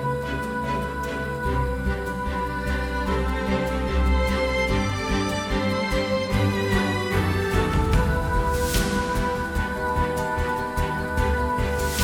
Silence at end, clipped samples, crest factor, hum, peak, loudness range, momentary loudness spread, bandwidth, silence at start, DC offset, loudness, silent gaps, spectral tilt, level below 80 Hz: 0 s; under 0.1%; 16 dB; none; -8 dBFS; 3 LU; 5 LU; 19 kHz; 0 s; under 0.1%; -24 LUFS; none; -5.5 dB/octave; -28 dBFS